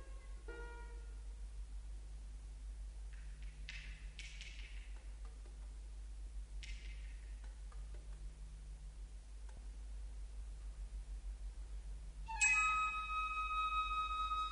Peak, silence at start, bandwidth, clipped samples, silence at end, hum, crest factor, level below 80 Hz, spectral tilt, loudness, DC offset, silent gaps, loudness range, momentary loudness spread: -22 dBFS; 0 s; 10.5 kHz; under 0.1%; 0 s; none; 22 dB; -50 dBFS; -1.5 dB/octave; -43 LUFS; under 0.1%; none; 16 LU; 17 LU